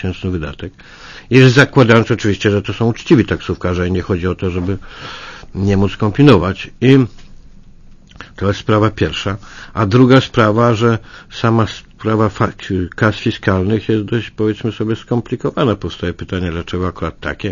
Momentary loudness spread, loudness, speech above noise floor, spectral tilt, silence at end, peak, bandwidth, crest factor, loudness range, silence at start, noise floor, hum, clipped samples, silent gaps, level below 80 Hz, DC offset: 13 LU; -15 LUFS; 25 dB; -7 dB/octave; 0 s; 0 dBFS; 7.4 kHz; 14 dB; 5 LU; 0 s; -39 dBFS; none; 0.1%; none; -38 dBFS; under 0.1%